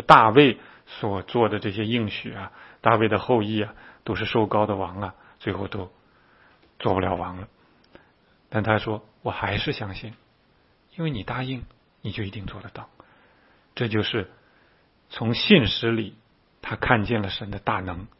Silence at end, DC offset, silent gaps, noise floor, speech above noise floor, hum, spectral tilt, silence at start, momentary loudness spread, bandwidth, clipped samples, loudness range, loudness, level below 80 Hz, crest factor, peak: 0.1 s; under 0.1%; none; -62 dBFS; 38 dB; none; -7.5 dB/octave; 0 s; 20 LU; 9.2 kHz; under 0.1%; 8 LU; -24 LUFS; -50 dBFS; 26 dB; 0 dBFS